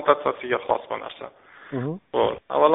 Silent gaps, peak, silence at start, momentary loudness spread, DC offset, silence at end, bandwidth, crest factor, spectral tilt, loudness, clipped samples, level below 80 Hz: none; -4 dBFS; 0 s; 15 LU; under 0.1%; 0 s; 4 kHz; 20 dB; -4 dB/octave; -25 LUFS; under 0.1%; -60 dBFS